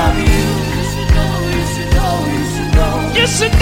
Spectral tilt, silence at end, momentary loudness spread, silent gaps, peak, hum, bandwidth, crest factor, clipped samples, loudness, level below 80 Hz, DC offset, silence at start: -5 dB/octave; 0 s; 5 LU; none; 0 dBFS; none; 16.5 kHz; 14 dB; under 0.1%; -15 LUFS; -18 dBFS; under 0.1%; 0 s